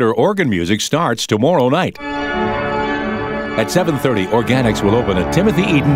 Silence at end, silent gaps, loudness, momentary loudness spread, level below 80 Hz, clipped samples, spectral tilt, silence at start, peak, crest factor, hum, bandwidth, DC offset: 0 s; none; -16 LUFS; 6 LU; -36 dBFS; under 0.1%; -5.5 dB/octave; 0 s; -2 dBFS; 14 dB; none; 16 kHz; under 0.1%